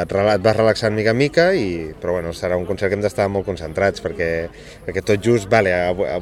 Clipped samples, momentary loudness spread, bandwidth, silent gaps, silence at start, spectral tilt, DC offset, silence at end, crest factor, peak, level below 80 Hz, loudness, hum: under 0.1%; 9 LU; 15 kHz; none; 0 s; -6 dB/octave; under 0.1%; 0 s; 18 dB; 0 dBFS; -42 dBFS; -19 LUFS; none